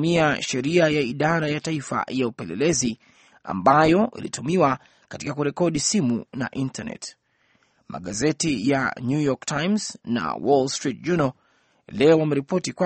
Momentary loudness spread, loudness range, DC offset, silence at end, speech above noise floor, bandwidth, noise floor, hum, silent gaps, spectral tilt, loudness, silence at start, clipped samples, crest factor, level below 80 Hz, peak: 13 LU; 4 LU; under 0.1%; 0 s; 42 dB; 8.8 kHz; -64 dBFS; none; none; -5 dB/octave; -23 LUFS; 0 s; under 0.1%; 20 dB; -56 dBFS; -4 dBFS